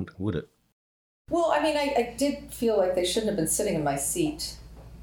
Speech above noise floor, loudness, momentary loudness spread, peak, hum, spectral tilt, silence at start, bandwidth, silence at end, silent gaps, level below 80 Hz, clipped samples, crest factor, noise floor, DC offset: over 63 dB; -27 LUFS; 8 LU; -12 dBFS; none; -4 dB/octave; 0 s; over 20 kHz; 0 s; 0.72-1.25 s; -50 dBFS; under 0.1%; 16 dB; under -90 dBFS; under 0.1%